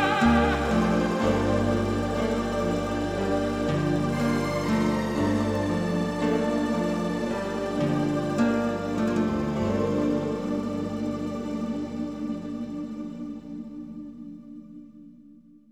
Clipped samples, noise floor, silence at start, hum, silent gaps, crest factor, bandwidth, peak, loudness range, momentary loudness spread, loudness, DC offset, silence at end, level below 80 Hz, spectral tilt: under 0.1%; -52 dBFS; 0 s; 50 Hz at -45 dBFS; none; 16 dB; 14.5 kHz; -10 dBFS; 9 LU; 14 LU; -26 LUFS; under 0.1%; 0.35 s; -42 dBFS; -6.5 dB/octave